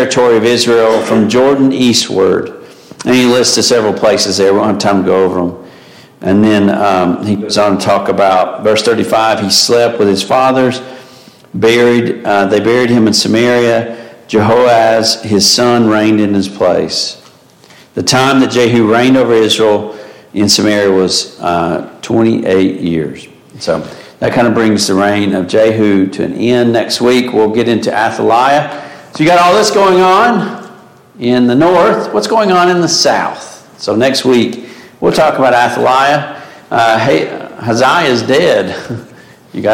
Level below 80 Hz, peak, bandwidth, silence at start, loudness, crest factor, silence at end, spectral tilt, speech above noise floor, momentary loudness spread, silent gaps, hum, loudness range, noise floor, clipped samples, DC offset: -50 dBFS; 0 dBFS; 17 kHz; 0 s; -10 LUFS; 10 dB; 0 s; -4 dB/octave; 32 dB; 11 LU; none; none; 2 LU; -41 dBFS; under 0.1%; under 0.1%